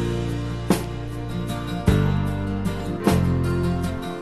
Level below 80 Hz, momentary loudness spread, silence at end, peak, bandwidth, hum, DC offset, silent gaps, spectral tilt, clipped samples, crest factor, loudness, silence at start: -32 dBFS; 8 LU; 0 s; -4 dBFS; 13.5 kHz; none; 0.6%; none; -7 dB/octave; under 0.1%; 20 dB; -24 LUFS; 0 s